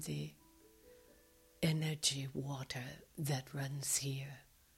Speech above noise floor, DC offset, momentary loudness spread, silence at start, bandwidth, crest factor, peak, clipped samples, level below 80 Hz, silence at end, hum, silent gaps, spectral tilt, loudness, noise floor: 27 dB; under 0.1%; 13 LU; 0 s; 16.5 kHz; 22 dB; -20 dBFS; under 0.1%; -68 dBFS; 0.35 s; none; none; -3.5 dB/octave; -39 LUFS; -66 dBFS